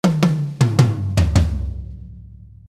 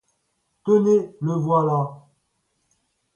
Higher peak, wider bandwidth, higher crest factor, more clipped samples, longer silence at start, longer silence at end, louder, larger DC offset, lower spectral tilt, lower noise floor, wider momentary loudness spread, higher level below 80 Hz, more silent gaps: first, 0 dBFS vs -8 dBFS; first, 14.5 kHz vs 7.2 kHz; about the same, 18 dB vs 16 dB; neither; second, 0.05 s vs 0.65 s; second, 0.25 s vs 1.2 s; first, -18 LUFS vs -21 LUFS; neither; second, -7 dB/octave vs -9.5 dB/octave; second, -40 dBFS vs -72 dBFS; first, 20 LU vs 11 LU; first, -26 dBFS vs -68 dBFS; neither